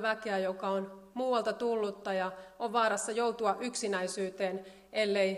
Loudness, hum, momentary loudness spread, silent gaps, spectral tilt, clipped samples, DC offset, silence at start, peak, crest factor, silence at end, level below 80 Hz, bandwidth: -33 LUFS; none; 7 LU; none; -3.5 dB/octave; under 0.1%; under 0.1%; 0 s; -16 dBFS; 18 dB; 0 s; -74 dBFS; 14 kHz